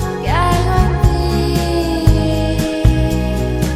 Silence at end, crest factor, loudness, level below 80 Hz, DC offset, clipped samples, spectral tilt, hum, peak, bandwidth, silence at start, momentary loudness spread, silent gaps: 0 s; 14 dB; -15 LUFS; -18 dBFS; under 0.1%; 0.2%; -6.5 dB/octave; none; 0 dBFS; 15 kHz; 0 s; 3 LU; none